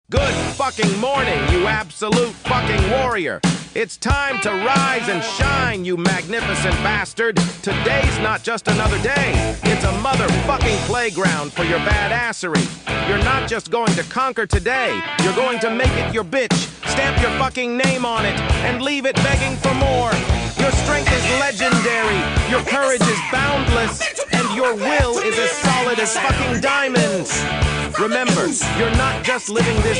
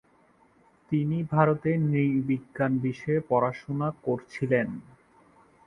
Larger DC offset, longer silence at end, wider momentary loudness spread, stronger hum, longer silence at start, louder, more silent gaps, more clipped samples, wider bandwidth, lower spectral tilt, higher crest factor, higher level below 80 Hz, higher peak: neither; second, 0 s vs 0.85 s; second, 4 LU vs 7 LU; neither; second, 0.1 s vs 0.9 s; first, -18 LUFS vs -27 LUFS; neither; neither; first, 10.5 kHz vs 6.4 kHz; second, -4.5 dB/octave vs -9.5 dB/octave; second, 14 dB vs 22 dB; first, -28 dBFS vs -62 dBFS; about the same, -4 dBFS vs -6 dBFS